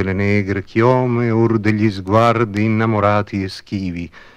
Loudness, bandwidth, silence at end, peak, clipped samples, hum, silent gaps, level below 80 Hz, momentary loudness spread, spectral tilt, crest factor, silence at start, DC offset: -17 LUFS; 9.6 kHz; 0.15 s; 0 dBFS; under 0.1%; none; none; -48 dBFS; 10 LU; -8 dB/octave; 16 dB; 0 s; 0.2%